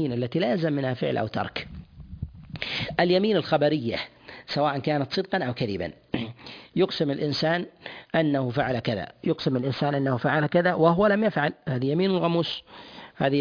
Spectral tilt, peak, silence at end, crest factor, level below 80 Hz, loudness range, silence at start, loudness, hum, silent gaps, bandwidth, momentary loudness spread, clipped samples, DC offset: -7.5 dB/octave; -6 dBFS; 0 s; 20 dB; -54 dBFS; 4 LU; 0 s; -25 LUFS; none; none; 5.4 kHz; 16 LU; under 0.1%; under 0.1%